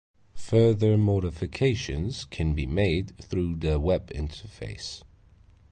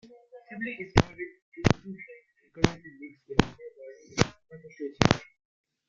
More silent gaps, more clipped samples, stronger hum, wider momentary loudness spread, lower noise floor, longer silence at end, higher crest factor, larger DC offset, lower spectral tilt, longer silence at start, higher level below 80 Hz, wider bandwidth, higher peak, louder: second, none vs 1.42-1.52 s; neither; neither; second, 15 LU vs 22 LU; about the same, -56 dBFS vs -54 dBFS; about the same, 0.75 s vs 0.7 s; second, 18 dB vs 30 dB; neither; first, -7 dB/octave vs -5.5 dB/octave; about the same, 0.35 s vs 0.35 s; first, -38 dBFS vs -44 dBFS; about the same, 9.4 kHz vs 9 kHz; second, -10 dBFS vs 0 dBFS; about the same, -27 LUFS vs -28 LUFS